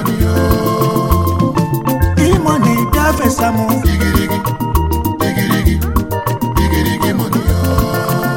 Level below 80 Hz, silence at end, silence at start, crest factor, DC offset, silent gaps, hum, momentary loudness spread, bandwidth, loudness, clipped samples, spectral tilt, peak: -22 dBFS; 0 s; 0 s; 14 dB; under 0.1%; none; none; 4 LU; 17 kHz; -14 LUFS; under 0.1%; -6 dB/octave; 0 dBFS